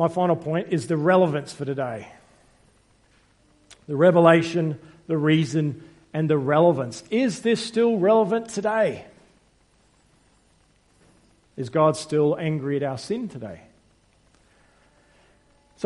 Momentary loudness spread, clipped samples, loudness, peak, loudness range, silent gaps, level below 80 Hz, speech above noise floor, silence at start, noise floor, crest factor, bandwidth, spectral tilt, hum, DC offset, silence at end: 14 LU; under 0.1%; -22 LUFS; -2 dBFS; 8 LU; none; -64 dBFS; 39 dB; 0 s; -61 dBFS; 22 dB; 11.5 kHz; -6.5 dB/octave; none; under 0.1%; 0 s